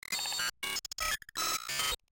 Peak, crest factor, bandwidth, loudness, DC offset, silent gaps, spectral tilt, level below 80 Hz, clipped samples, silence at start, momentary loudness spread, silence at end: -20 dBFS; 16 dB; 17 kHz; -33 LUFS; under 0.1%; none; 1 dB/octave; -56 dBFS; under 0.1%; 0.1 s; 3 LU; 0.15 s